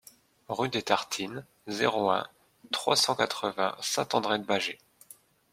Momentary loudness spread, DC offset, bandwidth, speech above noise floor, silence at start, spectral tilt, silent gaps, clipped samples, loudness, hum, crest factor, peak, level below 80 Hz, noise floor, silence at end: 13 LU; under 0.1%; 16.5 kHz; 27 dB; 0.5 s; -2.5 dB/octave; none; under 0.1%; -29 LUFS; none; 24 dB; -8 dBFS; -74 dBFS; -56 dBFS; 0.8 s